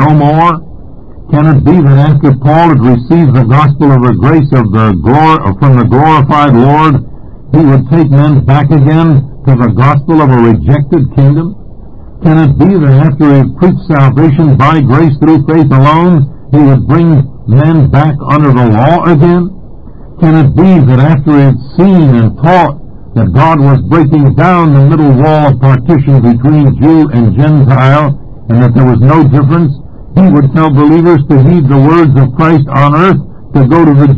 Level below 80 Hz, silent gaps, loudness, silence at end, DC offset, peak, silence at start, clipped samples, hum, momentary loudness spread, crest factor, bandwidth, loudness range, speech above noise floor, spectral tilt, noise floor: -28 dBFS; none; -6 LUFS; 0 s; under 0.1%; 0 dBFS; 0 s; 7%; none; 5 LU; 6 dB; 5 kHz; 2 LU; 24 dB; -10.5 dB/octave; -28 dBFS